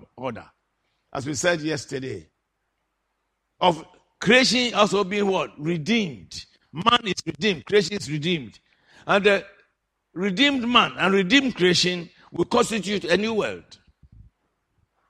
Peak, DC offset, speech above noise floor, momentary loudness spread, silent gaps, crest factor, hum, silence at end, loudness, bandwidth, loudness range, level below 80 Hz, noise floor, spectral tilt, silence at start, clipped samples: -2 dBFS; under 0.1%; 53 dB; 17 LU; none; 22 dB; none; 1.5 s; -22 LUFS; 14 kHz; 7 LU; -58 dBFS; -76 dBFS; -4 dB/octave; 0.15 s; under 0.1%